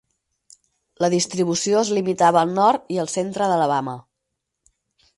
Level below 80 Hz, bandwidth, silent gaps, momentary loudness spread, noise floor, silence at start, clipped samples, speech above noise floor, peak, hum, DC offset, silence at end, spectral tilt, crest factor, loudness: -66 dBFS; 11.5 kHz; none; 8 LU; -79 dBFS; 1 s; under 0.1%; 60 dB; -4 dBFS; none; under 0.1%; 1.15 s; -4.5 dB/octave; 18 dB; -20 LUFS